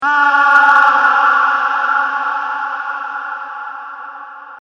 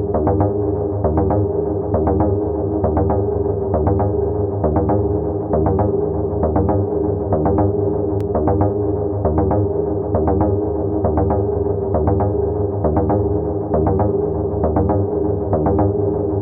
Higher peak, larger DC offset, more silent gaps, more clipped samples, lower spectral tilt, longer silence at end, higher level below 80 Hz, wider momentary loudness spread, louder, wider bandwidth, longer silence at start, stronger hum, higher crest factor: about the same, 0 dBFS vs -2 dBFS; neither; neither; neither; second, -1 dB/octave vs -13.5 dB/octave; about the same, 0.05 s vs 0 s; second, -68 dBFS vs -28 dBFS; first, 20 LU vs 3 LU; first, -12 LUFS vs -18 LUFS; first, 7.4 kHz vs 2.4 kHz; about the same, 0 s vs 0 s; neither; about the same, 14 dB vs 14 dB